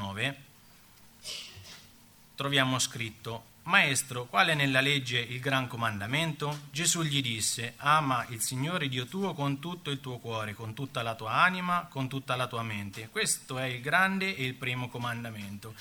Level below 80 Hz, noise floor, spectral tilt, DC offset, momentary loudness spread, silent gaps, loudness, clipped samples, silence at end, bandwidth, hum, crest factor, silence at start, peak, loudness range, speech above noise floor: -66 dBFS; -57 dBFS; -3 dB/octave; under 0.1%; 14 LU; none; -29 LUFS; under 0.1%; 0 s; 19.5 kHz; none; 24 dB; 0 s; -8 dBFS; 5 LU; 26 dB